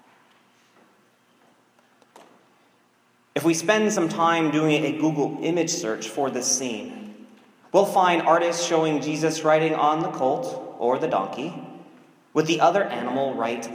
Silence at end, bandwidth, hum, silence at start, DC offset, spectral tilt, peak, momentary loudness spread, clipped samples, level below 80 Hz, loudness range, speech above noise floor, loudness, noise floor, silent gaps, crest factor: 0 s; 16 kHz; none; 3.35 s; under 0.1%; -4 dB/octave; -4 dBFS; 12 LU; under 0.1%; -78 dBFS; 4 LU; 40 dB; -23 LUFS; -62 dBFS; none; 20 dB